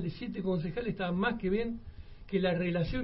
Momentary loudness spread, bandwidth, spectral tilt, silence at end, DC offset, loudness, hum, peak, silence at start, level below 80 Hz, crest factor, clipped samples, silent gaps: 11 LU; 5.8 kHz; -10.5 dB/octave; 0 s; under 0.1%; -33 LUFS; none; -18 dBFS; 0 s; -48 dBFS; 16 dB; under 0.1%; none